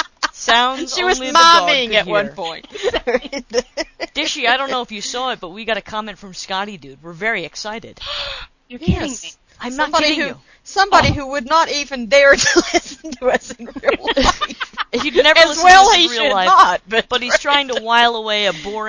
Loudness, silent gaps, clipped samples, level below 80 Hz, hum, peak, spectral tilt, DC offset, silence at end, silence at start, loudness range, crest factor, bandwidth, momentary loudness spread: -15 LUFS; none; 0.2%; -38 dBFS; none; 0 dBFS; -2.5 dB/octave; under 0.1%; 0 s; 0 s; 12 LU; 16 dB; 8 kHz; 17 LU